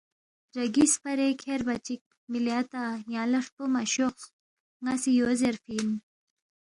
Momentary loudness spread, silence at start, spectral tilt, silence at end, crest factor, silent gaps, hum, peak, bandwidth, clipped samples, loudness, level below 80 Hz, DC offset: 13 LU; 0.55 s; -3 dB/octave; 0.7 s; 18 dB; 2.01-2.11 s, 2.17-2.28 s, 3.52-3.57 s, 4.33-4.80 s; none; -12 dBFS; 11.5 kHz; under 0.1%; -28 LUFS; -66 dBFS; under 0.1%